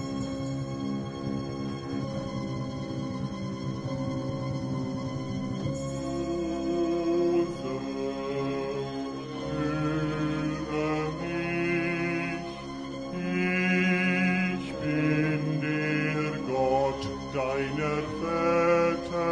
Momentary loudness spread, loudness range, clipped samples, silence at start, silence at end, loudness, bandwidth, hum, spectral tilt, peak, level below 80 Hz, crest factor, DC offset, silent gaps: 9 LU; 7 LU; under 0.1%; 0 s; 0 s; -29 LUFS; 10 kHz; none; -6.5 dB/octave; -12 dBFS; -52 dBFS; 16 dB; under 0.1%; none